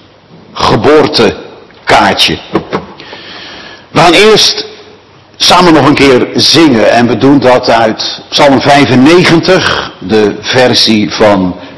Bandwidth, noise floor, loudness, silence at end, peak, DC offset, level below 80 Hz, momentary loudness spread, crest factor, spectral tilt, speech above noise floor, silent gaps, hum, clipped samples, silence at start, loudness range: 12 kHz; -37 dBFS; -6 LUFS; 0 s; 0 dBFS; under 0.1%; -36 dBFS; 17 LU; 6 dB; -4.5 dB/octave; 31 dB; none; none; 9%; 0.55 s; 4 LU